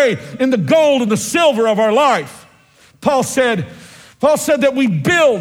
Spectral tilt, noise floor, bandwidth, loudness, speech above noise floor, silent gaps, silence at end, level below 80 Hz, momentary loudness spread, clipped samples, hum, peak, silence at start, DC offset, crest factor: -4.5 dB/octave; -49 dBFS; 17 kHz; -14 LUFS; 35 dB; none; 0 s; -54 dBFS; 7 LU; under 0.1%; none; 0 dBFS; 0 s; under 0.1%; 14 dB